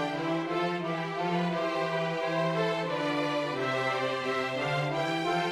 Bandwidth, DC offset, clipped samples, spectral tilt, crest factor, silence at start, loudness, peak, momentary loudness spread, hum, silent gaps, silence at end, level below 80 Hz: 14.5 kHz; under 0.1%; under 0.1%; -5.5 dB/octave; 14 dB; 0 s; -30 LUFS; -16 dBFS; 2 LU; none; none; 0 s; -70 dBFS